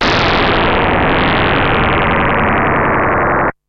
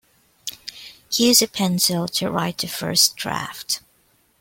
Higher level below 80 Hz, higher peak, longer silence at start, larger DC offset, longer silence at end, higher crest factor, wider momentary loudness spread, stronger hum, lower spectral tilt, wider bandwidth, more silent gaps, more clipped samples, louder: first, -24 dBFS vs -58 dBFS; second, -6 dBFS vs -2 dBFS; second, 0 s vs 0.45 s; neither; second, 0.15 s vs 0.65 s; second, 6 dB vs 22 dB; second, 1 LU vs 19 LU; neither; first, -6.5 dB/octave vs -2.5 dB/octave; second, 7.6 kHz vs 17 kHz; neither; neither; first, -12 LUFS vs -19 LUFS